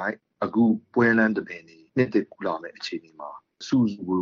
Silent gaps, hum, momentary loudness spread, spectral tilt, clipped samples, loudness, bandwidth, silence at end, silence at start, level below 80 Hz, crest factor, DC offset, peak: none; none; 19 LU; -5 dB/octave; under 0.1%; -24 LUFS; 7.2 kHz; 0 s; 0 s; -66 dBFS; 18 dB; under 0.1%; -8 dBFS